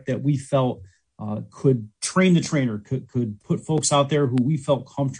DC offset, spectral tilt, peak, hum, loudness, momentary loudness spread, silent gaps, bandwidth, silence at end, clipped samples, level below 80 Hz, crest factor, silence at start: under 0.1%; -5.5 dB/octave; -6 dBFS; none; -23 LUFS; 12 LU; none; 10.5 kHz; 0 s; under 0.1%; -60 dBFS; 18 dB; 0.05 s